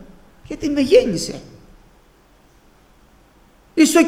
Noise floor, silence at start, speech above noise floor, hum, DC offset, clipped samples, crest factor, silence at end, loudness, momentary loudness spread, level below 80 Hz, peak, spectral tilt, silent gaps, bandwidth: -52 dBFS; 0 s; 35 dB; none; under 0.1%; under 0.1%; 20 dB; 0 s; -18 LUFS; 18 LU; -46 dBFS; -2 dBFS; -4 dB/octave; none; 15.5 kHz